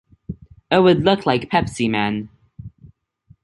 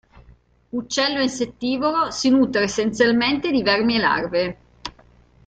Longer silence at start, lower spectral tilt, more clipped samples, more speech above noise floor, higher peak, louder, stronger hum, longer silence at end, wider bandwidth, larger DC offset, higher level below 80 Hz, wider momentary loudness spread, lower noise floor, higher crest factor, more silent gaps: about the same, 0.3 s vs 0.3 s; first, -6 dB/octave vs -3.5 dB/octave; neither; first, 37 dB vs 33 dB; about the same, -2 dBFS vs -2 dBFS; about the same, -18 LUFS vs -20 LUFS; second, none vs 60 Hz at -45 dBFS; first, 0.75 s vs 0.55 s; first, 11.5 kHz vs 9 kHz; neither; first, -46 dBFS vs -52 dBFS; first, 23 LU vs 13 LU; about the same, -55 dBFS vs -53 dBFS; about the same, 18 dB vs 18 dB; neither